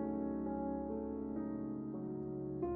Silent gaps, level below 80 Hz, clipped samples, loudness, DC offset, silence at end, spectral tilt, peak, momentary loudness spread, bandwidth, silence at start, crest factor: none; -60 dBFS; under 0.1%; -41 LUFS; under 0.1%; 0 s; -12 dB/octave; -28 dBFS; 3 LU; 2.6 kHz; 0 s; 12 dB